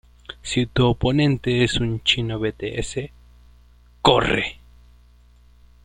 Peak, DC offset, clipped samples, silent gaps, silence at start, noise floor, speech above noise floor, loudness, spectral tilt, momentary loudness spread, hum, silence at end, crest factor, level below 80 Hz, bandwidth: -2 dBFS; under 0.1%; under 0.1%; none; 0.3 s; -51 dBFS; 31 dB; -21 LUFS; -5 dB/octave; 12 LU; 60 Hz at -45 dBFS; 1.3 s; 22 dB; -40 dBFS; 10.5 kHz